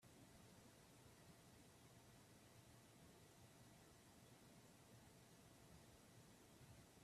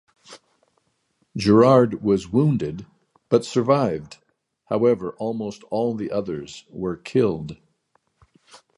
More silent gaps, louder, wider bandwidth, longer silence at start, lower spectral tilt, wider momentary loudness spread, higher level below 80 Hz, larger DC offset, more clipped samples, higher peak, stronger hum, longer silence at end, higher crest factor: neither; second, -67 LUFS vs -22 LUFS; first, 15 kHz vs 11.5 kHz; second, 0 s vs 0.3 s; second, -4 dB/octave vs -7.5 dB/octave; second, 1 LU vs 16 LU; second, -82 dBFS vs -54 dBFS; neither; neither; second, -54 dBFS vs -2 dBFS; neither; second, 0 s vs 1.25 s; second, 14 dB vs 20 dB